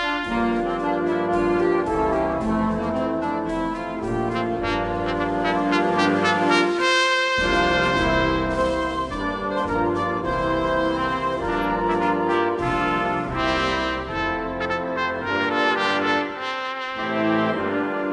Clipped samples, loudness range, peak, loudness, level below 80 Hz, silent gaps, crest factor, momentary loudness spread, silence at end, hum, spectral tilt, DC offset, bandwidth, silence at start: under 0.1%; 4 LU; -6 dBFS; -22 LUFS; -40 dBFS; none; 16 dB; 6 LU; 0 s; none; -5 dB/octave; under 0.1%; 11 kHz; 0 s